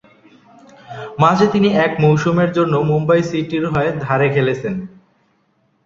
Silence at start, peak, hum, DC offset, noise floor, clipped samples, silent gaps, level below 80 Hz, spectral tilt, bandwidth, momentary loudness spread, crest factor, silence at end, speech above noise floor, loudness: 0.9 s; 0 dBFS; none; under 0.1%; -61 dBFS; under 0.1%; none; -50 dBFS; -7.5 dB/octave; 7.6 kHz; 14 LU; 16 dB; 0.95 s; 46 dB; -16 LUFS